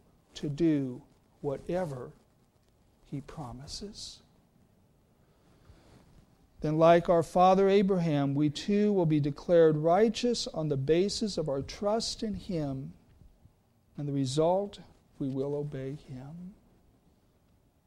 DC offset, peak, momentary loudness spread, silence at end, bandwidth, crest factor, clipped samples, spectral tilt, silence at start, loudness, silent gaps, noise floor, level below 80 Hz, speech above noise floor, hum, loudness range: under 0.1%; -10 dBFS; 20 LU; 1.35 s; 12.5 kHz; 20 dB; under 0.1%; -6.5 dB/octave; 0.35 s; -28 LUFS; none; -66 dBFS; -56 dBFS; 38 dB; none; 20 LU